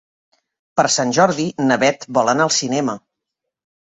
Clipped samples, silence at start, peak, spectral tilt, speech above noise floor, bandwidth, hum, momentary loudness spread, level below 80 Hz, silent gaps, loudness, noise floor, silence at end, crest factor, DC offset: under 0.1%; 0.75 s; -2 dBFS; -3.5 dB/octave; 64 dB; 8.4 kHz; none; 7 LU; -62 dBFS; none; -17 LUFS; -81 dBFS; 1 s; 18 dB; under 0.1%